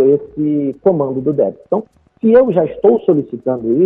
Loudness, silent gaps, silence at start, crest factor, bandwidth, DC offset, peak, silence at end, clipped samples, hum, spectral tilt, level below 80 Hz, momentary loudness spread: -15 LUFS; none; 0 s; 14 dB; 3.8 kHz; under 0.1%; 0 dBFS; 0 s; under 0.1%; none; -11.5 dB/octave; -52 dBFS; 9 LU